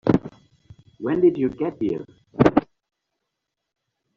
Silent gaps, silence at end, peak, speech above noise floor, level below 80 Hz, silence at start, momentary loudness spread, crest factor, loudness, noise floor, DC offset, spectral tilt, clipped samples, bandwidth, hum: none; 1.55 s; -2 dBFS; 60 dB; -52 dBFS; 0.05 s; 13 LU; 22 dB; -22 LUFS; -81 dBFS; under 0.1%; -7.5 dB/octave; under 0.1%; 7.2 kHz; none